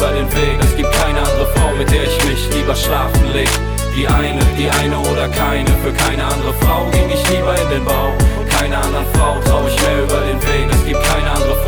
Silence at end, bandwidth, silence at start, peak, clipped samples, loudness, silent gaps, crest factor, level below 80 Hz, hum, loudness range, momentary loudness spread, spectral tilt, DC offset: 0 s; over 20 kHz; 0 s; -4 dBFS; under 0.1%; -15 LUFS; none; 10 dB; -18 dBFS; none; 0 LU; 2 LU; -4.5 dB/octave; under 0.1%